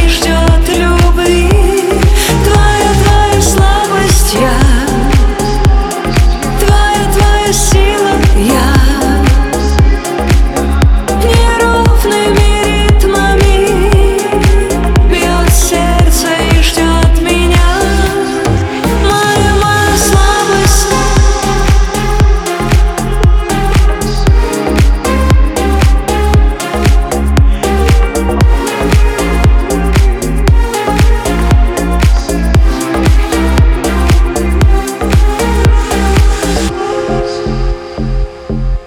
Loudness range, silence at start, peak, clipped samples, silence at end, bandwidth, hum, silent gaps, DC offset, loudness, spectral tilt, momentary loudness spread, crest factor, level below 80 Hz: 2 LU; 0 s; 0 dBFS; under 0.1%; 0 s; 16 kHz; none; none; under 0.1%; -10 LUFS; -5 dB/octave; 4 LU; 8 dB; -10 dBFS